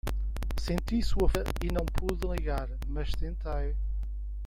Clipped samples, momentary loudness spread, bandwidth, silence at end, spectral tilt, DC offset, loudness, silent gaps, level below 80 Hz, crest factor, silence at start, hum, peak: under 0.1%; 7 LU; 16 kHz; 0 s; -6.5 dB/octave; under 0.1%; -33 LUFS; none; -32 dBFS; 18 dB; 0.05 s; none; -12 dBFS